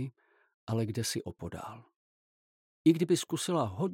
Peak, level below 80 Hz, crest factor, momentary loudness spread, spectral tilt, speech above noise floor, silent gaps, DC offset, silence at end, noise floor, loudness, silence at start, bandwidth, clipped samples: -12 dBFS; -66 dBFS; 20 dB; 16 LU; -5.5 dB/octave; over 59 dB; 0.54-0.67 s, 1.96-2.85 s; under 0.1%; 0 s; under -90 dBFS; -32 LUFS; 0 s; 16.5 kHz; under 0.1%